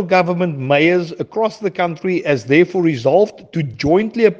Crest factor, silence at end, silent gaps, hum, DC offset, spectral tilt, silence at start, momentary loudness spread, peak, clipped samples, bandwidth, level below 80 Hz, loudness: 16 dB; 0 s; none; none; under 0.1%; -7 dB/octave; 0 s; 7 LU; 0 dBFS; under 0.1%; 7.6 kHz; -54 dBFS; -16 LUFS